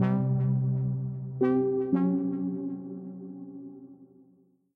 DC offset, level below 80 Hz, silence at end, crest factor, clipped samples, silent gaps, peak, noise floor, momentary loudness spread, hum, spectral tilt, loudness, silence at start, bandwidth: under 0.1%; -68 dBFS; 0.7 s; 16 dB; under 0.1%; none; -14 dBFS; -63 dBFS; 17 LU; none; -12.5 dB/octave; -28 LUFS; 0 s; 3.6 kHz